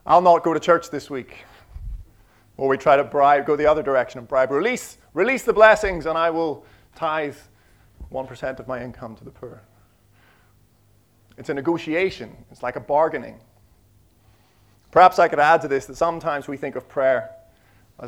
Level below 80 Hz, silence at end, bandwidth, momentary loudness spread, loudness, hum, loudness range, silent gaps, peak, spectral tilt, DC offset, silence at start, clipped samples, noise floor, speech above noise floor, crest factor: -48 dBFS; 0 s; 15.5 kHz; 24 LU; -20 LUFS; none; 15 LU; none; 0 dBFS; -5 dB/octave; under 0.1%; 0.05 s; under 0.1%; -58 dBFS; 38 dB; 22 dB